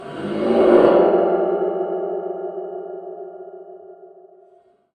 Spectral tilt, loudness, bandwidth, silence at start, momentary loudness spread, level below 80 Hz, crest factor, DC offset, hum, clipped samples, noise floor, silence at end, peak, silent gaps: -8 dB/octave; -18 LUFS; 9 kHz; 0 s; 23 LU; -58 dBFS; 20 dB; under 0.1%; none; under 0.1%; -54 dBFS; 0.9 s; 0 dBFS; none